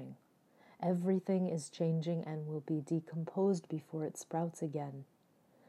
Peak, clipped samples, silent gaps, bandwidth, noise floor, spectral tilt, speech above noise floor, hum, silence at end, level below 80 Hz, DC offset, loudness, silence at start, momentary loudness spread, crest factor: -22 dBFS; under 0.1%; none; 13 kHz; -69 dBFS; -7.5 dB/octave; 33 dB; none; 0.65 s; under -90 dBFS; under 0.1%; -37 LUFS; 0 s; 8 LU; 16 dB